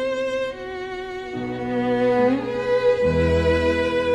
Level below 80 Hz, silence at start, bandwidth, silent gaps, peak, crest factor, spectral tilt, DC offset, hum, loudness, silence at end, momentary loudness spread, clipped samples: -38 dBFS; 0 s; 9.4 kHz; none; -8 dBFS; 14 dB; -7 dB/octave; under 0.1%; none; -22 LUFS; 0 s; 12 LU; under 0.1%